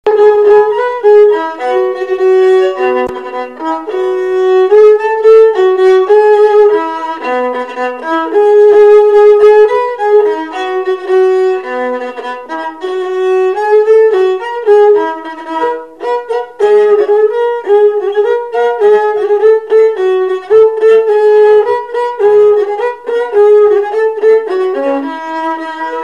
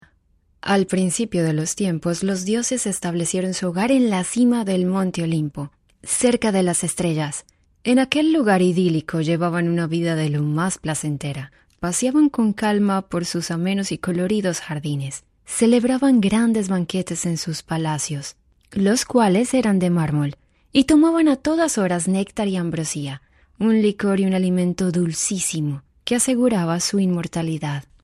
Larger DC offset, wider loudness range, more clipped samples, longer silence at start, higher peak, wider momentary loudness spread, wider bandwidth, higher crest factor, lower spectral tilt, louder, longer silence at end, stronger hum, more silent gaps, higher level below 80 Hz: first, 0.3% vs under 0.1%; about the same, 4 LU vs 3 LU; first, 0.5% vs under 0.1%; second, 0.05 s vs 0.65 s; about the same, 0 dBFS vs 0 dBFS; about the same, 12 LU vs 10 LU; second, 7.2 kHz vs 14.5 kHz; second, 8 dB vs 20 dB; about the same, -4.5 dB/octave vs -5 dB/octave; first, -9 LUFS vs -20 LUFS; second, 0 s vs 0.25 s; neither; neither; about the same, -56 dBFS vs -52 dBFS